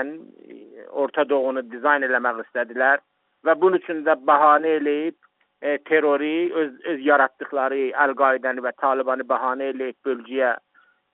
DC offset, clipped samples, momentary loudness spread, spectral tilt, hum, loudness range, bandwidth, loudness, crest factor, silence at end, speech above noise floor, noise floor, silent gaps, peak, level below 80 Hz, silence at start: under 0.1%; under 0.1%; 9 LU; -1.5 dB/octave; none; 3 LU; 4.1 kHz; -21 LUFS; 20 dB; 0.55 s; 21 dB; -43 dBFS; none; -2 dBFS; -74 dBFS; 0 s